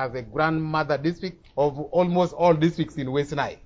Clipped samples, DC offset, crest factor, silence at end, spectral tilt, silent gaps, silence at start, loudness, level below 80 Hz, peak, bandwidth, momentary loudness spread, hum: under 0.1%; under 0.1%; 16 dB; 0.1 s; -7.5 dB/octave; none; 0 s; -24 LUFS; -52 dBFS; -8 dBFS; 7.8 kHz; 9 LU; none